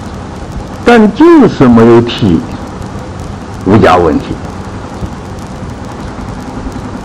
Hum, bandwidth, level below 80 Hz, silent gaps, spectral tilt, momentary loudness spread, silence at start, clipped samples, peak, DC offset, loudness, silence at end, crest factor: none; 11.5 kHz; -28 dBFS; none; -7 dB/octave; 18 LU; 0 s; 2%; 0 dBFS; under 0.1%; -6 LUFS; 0 s; 10 dB